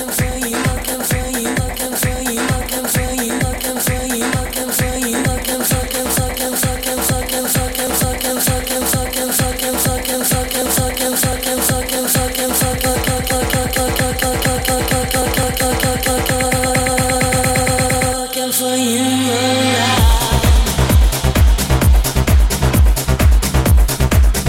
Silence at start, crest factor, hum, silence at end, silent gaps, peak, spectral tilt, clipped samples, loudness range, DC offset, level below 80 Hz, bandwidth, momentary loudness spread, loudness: 0 s; 14 dB; none; 0 s; none; -2 dBFS; -4 dB/octave; under 0.1%; 4 LU; under 0.1%; -20 dBFS; 17 kHz; 4 LU; -15 LUFS